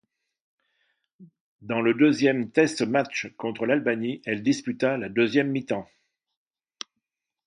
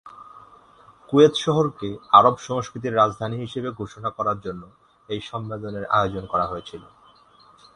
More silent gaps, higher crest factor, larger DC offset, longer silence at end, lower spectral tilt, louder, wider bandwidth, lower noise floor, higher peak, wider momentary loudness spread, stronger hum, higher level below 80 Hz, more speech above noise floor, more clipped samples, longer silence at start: first, 1.40-1.59 s vs none; about the same, 20 dB vs 24 dB; neither; first, 1.6 s vs 0.95 s; about the same, -5.5 dB/octave vs -6 dB/octave; second, -25 LUFS vs -22 LUFS; about the same, 10.5 kHz vs 10.5 kHz; first, -83 dBFS vs -53 dBFS; second, -6 dBFS vs 0 dBFS; second, 12 LU vs 17 LU; neither; second, -70 dBFS vs -54 dBFS; first, 59 dB vs 31 dB; neither; first, 1.2 s vs 0.05 s